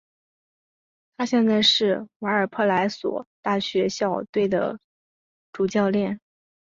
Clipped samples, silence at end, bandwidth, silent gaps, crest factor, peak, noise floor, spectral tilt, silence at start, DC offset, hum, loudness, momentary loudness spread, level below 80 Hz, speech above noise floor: under 0.1%; 0.45 s; 7.6 kHz; 2.16-2.20 s, 3.27-3.43 s, 4.29-4.33 s, 4.84-5.53 s; 18 dB; -8 dBFS; under -90 dBFS; -4.5 dB/octave; 1.2 s; under 0.1%; none; -23 LUFS; 12 LU; -64 dBFS; over 67 dB